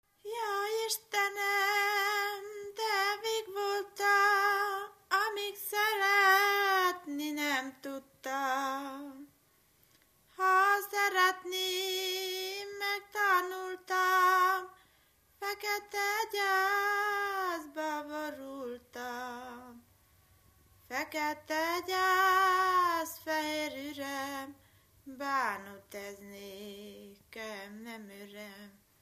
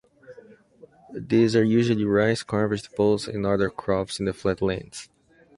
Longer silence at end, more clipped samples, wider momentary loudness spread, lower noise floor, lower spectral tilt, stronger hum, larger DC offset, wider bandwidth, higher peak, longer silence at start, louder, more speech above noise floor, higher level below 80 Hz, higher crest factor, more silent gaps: second, 0.3 s vs 0.55 s; neither; first, 20 LU vs 12 LU; first, -68 dBFS vs -53 dBFS; second, -1 dB/octave vs -6.5 dB/octave; neither; neither; first, 15 kHz vs 11.5 kHz; second, -14 dBFS vs -6 dBFS; about the same, 0.25 s vs 0.3 s; second, -31 LUFS vs -24 LUFS; first, 36 dB vs 30 dB; second, -76 dBFS vs -52 dBFS; about the same, 20 dB vs 18 dB; neither